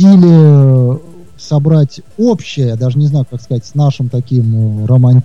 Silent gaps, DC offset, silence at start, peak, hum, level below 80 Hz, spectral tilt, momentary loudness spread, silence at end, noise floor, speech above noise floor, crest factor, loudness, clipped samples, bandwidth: none; 2%; 0 s; 0 dBFS; none; -48 dBFS; -9 dB/octave; 12 LU; 0 s; -34 dBFS; 25 dB; 10 dB; -11 LUFS; under 0.1%; 7.2 kHz